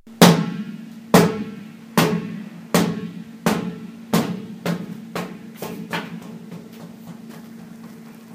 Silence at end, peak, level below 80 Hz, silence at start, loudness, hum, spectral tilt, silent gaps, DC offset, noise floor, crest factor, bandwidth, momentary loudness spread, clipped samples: 0 s; 0 dBFS; -56 dBFS; 0.05 s; -21 LUFS; none; -5 dB/octave; none; under 0.1%; -40 dBFS; 22 dB; 15.5 kHz; 23 LU; under 0.1%